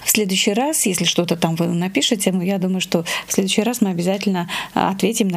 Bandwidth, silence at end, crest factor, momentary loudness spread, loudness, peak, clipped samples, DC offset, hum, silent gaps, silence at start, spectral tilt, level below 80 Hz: 16 kHz; 0 s; 18 dB; 4 LU; -19 LUFS; 0 dBFS; under 0.1%; under 0.1%; none; none; 0 s; -4 dB/octave; -58 dBFS